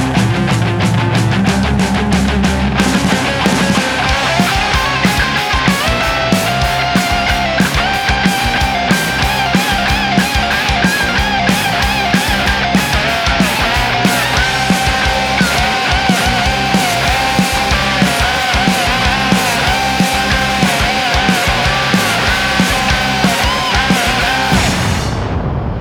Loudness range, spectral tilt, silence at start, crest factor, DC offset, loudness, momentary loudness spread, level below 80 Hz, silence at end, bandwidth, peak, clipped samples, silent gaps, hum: 1 LU; -4 dB/octave; 0 s; 12 dB; under 0.1%; -12 LUFS; 2 LU; -24 dBFS; 0 s; over 20 kHz; 0 dBFS; under 0.1%; none; none